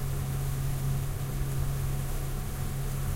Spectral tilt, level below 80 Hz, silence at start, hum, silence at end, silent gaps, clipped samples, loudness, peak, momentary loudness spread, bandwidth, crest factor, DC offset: -6 dB/octave; -34 dBFS; 0 s; none; 0 s; none; under 0.1%; -33 LUFS; -18 dBFS; 3 LU; 16 kHz; 12 dB; under 0.1%